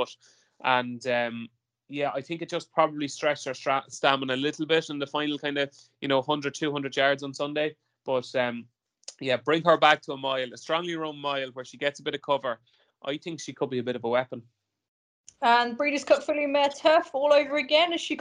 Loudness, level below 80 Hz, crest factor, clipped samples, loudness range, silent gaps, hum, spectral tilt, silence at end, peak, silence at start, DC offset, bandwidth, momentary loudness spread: -27 LUFS; -76 dBFS; 24 dB; under 0.1%; 7 LU; 14.88-15.24 s; none; -4 dB/octave; 0 s; -4 dBFS; 0 s; under 0.1%; 10.5 kHz; 12 LU